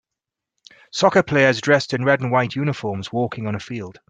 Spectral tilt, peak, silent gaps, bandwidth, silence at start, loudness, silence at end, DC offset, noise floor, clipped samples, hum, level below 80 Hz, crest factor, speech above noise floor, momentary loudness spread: -5.5 dB/octave; -2 dBFS; none; 9.2 kHz; 0.95 s; -19 LUFS; 0.2 s; under 0.1%; -85 dBFS; under 0.1%; none; -58 dBFS; 18 dB; 65 dB; 12 LU